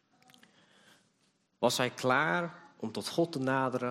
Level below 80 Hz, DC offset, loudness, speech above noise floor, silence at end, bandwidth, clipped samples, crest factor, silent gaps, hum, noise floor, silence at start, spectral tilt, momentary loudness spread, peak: -76 dBFS; under 0.1%; -31 LUFS; 43 dB; 0 s; 14.5 kHz; under 0.1%; 20 dB; none; none; -73 dBFS; 1.6 s; -4.5 dB/octave; 12 LU; -14 dBFS